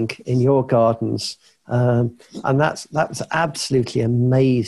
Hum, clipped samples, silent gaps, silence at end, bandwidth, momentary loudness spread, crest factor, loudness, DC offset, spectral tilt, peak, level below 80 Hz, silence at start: none; under 0.1%; none; 0 s; 12 kHz; 9 LU; 14 dB; -20 LUFS; under 0.1%; -6.5 dB/octave; -6 dBFS; -52 dBFS; 0 s